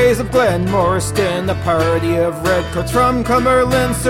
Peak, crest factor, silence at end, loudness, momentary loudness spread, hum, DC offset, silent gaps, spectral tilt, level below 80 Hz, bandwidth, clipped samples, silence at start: -4 dBFS; 12 dB; 0 s; -15 LUFS; 4 LU; none; 0.3%; none; -5.5 dB/octave; -32 dBFS; 16.5 kHz; under 0.1%; 0 s